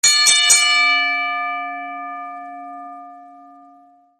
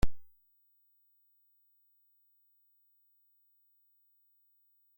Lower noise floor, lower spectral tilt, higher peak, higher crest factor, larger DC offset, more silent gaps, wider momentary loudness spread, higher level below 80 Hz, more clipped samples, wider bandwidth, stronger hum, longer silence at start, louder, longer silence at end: second, -50 dBFS vs -71 dBFS; second, 3 dB/octave vs -6 dB/octave; first, 0 dBFS vs -14 dBFS; about the same, 20 dB vs 24 dB; neither; neither; first, 23 LU vs 0 LU; second, -72 dBFS vs -48 dBFS; neither; second, 13 kHz vs 16.5 kHz; second, none vs 50 Hz at -120 dBFS; about the same, 0.05 s vs 0.05 s; first, -13 LUFS vs -57 LUFS; second, 0.8 s vs 4.75 s